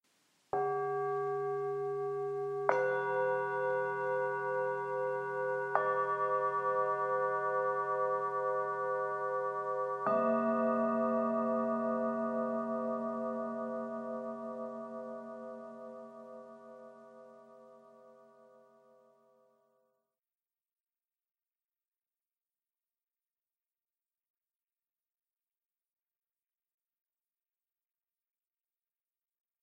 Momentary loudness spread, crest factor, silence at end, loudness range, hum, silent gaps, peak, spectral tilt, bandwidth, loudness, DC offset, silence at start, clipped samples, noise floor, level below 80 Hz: 15 LU; 26 dB; 11.5 s; 14 LU; none; none; -12 dBFS; -7.5 dB/octave; 9 kHz; -34 LUFS; under 0.1%; 0.55 s; under 0.1%; under -90 dBFS; under -90 dBFS